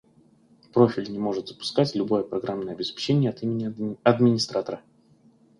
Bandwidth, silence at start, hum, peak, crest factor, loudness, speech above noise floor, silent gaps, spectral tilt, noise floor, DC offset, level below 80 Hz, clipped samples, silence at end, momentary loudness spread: 11.5 kHz; 0.75 s; none; -4 dBFS; 20 dB; -25 LUFS; 34 dB; none; -6.5 dB/octave; -58 dBFS; under 0.1%; -64 dBFS; under 0.1%; 0.8 s; 10 LU